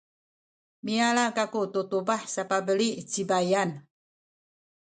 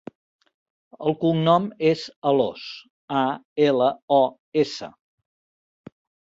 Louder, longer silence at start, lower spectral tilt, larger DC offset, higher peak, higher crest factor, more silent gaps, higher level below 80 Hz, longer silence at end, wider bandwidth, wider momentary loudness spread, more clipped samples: second, -27 LUFS vs -22 LUFS; second, 0.85 s vs 1 s; second, -4 dB/octave vs -7 dB/octave; neither; second, -10 dBFS vs -6 dBFS; about the same, 20 dB vs 18 dB; second, none vs 2.16-2.22 s, 2.90-3.08 s, 3.45-3.56 s, 4.02-4.08 s, 4.39-4.52 s; second, -76 dBFS vs -68 dBFS; second, 1.1 s vs 1.4 s; first, 9.4 kHz vs 7.8 kHz; second, 8 LU vs 15 LU; neither